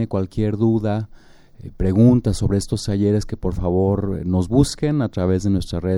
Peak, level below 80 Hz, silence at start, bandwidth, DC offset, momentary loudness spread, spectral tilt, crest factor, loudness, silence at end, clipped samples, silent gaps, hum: -2 dBFS; -34 dBFS; 0 s; 12.5 kHz; under 0.1%; 9 LU; -7.5 dB/octave; 16 dB; -20 LUFS; 0 s; under 0.1%; none; none